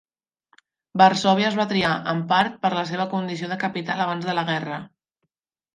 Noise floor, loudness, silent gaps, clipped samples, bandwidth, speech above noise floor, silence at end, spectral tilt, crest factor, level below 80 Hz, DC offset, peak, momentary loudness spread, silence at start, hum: -78 dBFS; -22 LUFS; none; under 0.1%; 10.5 kHz; 57 dB; 0.9 s; -5.5 dB/octave; 22 dB; -64 dBFS; under 0.1%; -2 dBFS; 10 LU; 0.95 s; none